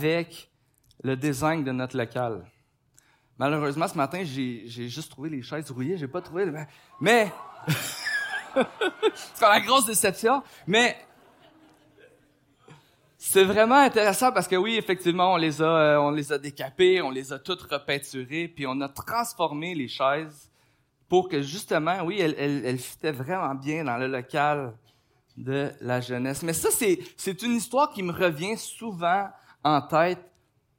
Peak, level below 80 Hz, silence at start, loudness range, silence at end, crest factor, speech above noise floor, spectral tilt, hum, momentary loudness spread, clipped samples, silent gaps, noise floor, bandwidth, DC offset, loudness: -6 dBFS; -66 dBFS; 0 s; 8 LU; 0.55 s; 20 dB; 41 dB; -4 dB/octave; none; 13 LU; under 0.1%; none; -66 dBFS; 16.5 kHz; under 0.1%; -25 LUFS